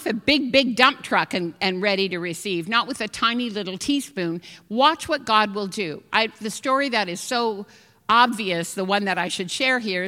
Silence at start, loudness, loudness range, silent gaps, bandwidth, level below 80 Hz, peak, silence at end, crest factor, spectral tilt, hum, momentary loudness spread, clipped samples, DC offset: 0 s; -22 LUFS; 2 LU; none; 16.5 kHz; -60 dBFS; 0 dBFS; 0 s; 22 dB; -3.5 dB/octave; none; 10 LU; under 0.1%; under 0.1%